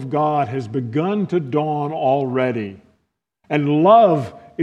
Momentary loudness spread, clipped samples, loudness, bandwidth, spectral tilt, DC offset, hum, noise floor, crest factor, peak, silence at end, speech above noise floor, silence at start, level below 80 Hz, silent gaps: 12 LU; under 0.1%; -18 LUFS; 8.2 kHz; -8.5 dB/octave; under 0.1%; none; -70 dBFS; 18 dB; 0 dBFS; 0 s; 52 dB; 0 s; -64 dBFS; none